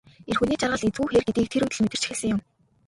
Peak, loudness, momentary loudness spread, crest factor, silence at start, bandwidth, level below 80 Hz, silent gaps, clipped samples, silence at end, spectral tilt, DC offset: -8 dBFS; -25 LUFS; 5 LU; 16 dB; 0.25 s; 11.5 kHz; -50 dBFS; none; under 0.1%; 0.45 s; -4.5 dB/octave; under 0.1%